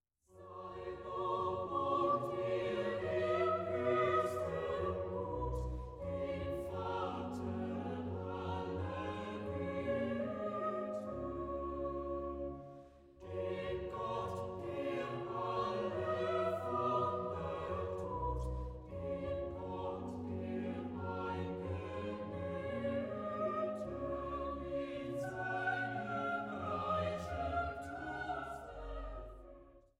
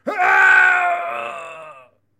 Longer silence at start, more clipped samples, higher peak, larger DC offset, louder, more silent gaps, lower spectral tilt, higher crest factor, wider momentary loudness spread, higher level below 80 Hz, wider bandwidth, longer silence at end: first, 0.3 s vs 0.05 s; neither; second, -22 dBFS vs -2 dBFS; neither; second, -40 LUFS vs -14 LUFS; neither; first, -7.5 dB/octave vs -2 dB/octave; about the same, 18 dB vs 16 dB; second, 9 LU vs 21 LU; first, -54 dBFS vs -66 dBFS; about the same, 14 kHz vs 13 kHz; second, 0.2 s vs 0.5 s